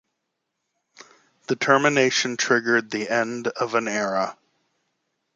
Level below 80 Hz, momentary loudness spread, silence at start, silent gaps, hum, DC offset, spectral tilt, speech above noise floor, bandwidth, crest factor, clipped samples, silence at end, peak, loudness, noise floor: -74 dBFS; 9 LU; 1.5 s; none; none; under 0.1%; -3 dB/octave; 57 dB; 9.4 kHz; 22 dB; under 0.1%; 1.05 s; -2 dBFS; -22 LUFS; -79 dBFS